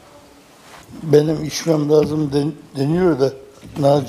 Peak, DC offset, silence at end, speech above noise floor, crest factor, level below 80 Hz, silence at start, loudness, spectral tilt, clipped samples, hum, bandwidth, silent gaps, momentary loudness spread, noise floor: 0 dBFS; under 0.1%; 0 s; 29 dB; 18 dB; -50 dBFS; 0.75 s; -18 LUFS; -6.5 dB/octave; under 0.1%; none; 15 kHz; none; 16 LU; -46 dBFS